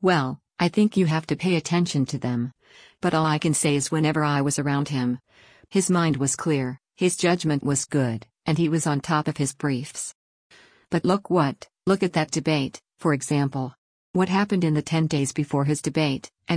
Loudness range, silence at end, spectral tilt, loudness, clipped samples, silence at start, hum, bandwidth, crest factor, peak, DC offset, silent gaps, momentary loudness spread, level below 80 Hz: 2 LU; 0 s; -5 dB/octave; -24 LUFS; under 0.1%; 0 s; none; 10.5 kHz; 16 dB; -8 dBFS; under 0.1%; 10.15-10.50 s, 13.78-14.14 s; 7 LU; -60 dBFS